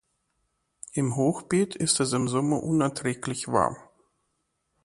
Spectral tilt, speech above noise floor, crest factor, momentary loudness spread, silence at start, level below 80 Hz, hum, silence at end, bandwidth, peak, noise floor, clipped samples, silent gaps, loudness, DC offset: -5 dB/octave; 51 dB; 20 dB; 8 LU; 0.95 s; -60 dBFS; none; 1 s; 11.5 kHz; -6 dBFS; -76 dBFS; under 0.1%; none; -26 LUFS; under 0.1%